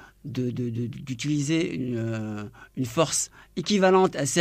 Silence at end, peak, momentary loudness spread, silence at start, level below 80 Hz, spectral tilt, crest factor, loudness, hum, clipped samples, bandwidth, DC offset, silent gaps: 0 s; -8 dBFS; 13 LU; 0 s; -58 dBFS; -4.5 dB/octave; 18 dB; -26 LUFS; none; under 0.1%; 15.5 kHz; under 0.1%; none